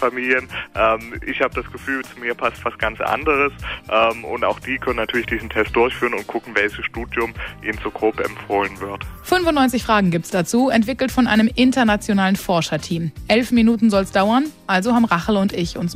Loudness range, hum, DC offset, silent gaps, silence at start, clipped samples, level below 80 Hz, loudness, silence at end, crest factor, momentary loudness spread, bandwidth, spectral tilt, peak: 4 LU; none; under 0.1%; none; 0 s; under 0.1%; -40 dBFS; -19 LUFS; 0 s; 16 dB; 9 LU; 16 kHz; -5 dB/octave; -4 dBFS